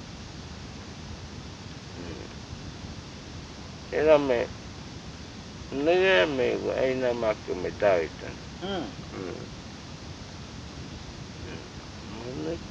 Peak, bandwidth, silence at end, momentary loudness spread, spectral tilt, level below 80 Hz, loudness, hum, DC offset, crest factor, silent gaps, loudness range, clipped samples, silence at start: -8 dBFS; 9 kHz; 0 s; 19 LU; -5 dB/octave; -50 dBFS; -27 LUFS; none; under 0.1%; 22 dB; none; 15 LU; under 0.1%; 0 s